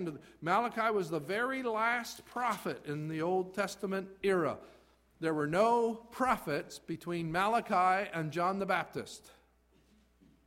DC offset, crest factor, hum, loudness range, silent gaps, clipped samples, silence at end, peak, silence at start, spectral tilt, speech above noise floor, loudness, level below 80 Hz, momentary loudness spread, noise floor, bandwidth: under 0.1%; 18 dB; none; 3 LU; none; under 0.1%; 1.15 s; -16 dBFS; 0 s; -5.5 dB/octave; 35 dB; -33 LUFS; -68 dBFS; 12 LU; -68 dBFS; 16 kHz